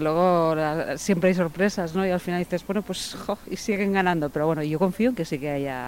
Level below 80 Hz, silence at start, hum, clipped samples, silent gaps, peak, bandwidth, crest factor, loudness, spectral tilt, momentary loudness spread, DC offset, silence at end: -52 dBFS; 0 s; none; under 0.1%; none; -8 dBFS; 16.5 kHz; 16 dB; -25 LUFS; -6 dB/octave; 8 LU; under 0.1%; 0 s